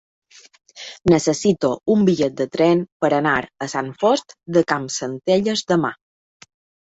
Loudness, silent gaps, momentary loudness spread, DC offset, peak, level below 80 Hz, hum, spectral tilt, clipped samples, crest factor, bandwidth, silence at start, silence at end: -19 LUFS; 2.92-3.00 s; 9 LU; under 0.1%; -2 dBFS; -54 dBFS; none; -5 dB/octave; under 0.1%; 18 dB; 8.2 kHz; 0.75 s; 0.9 s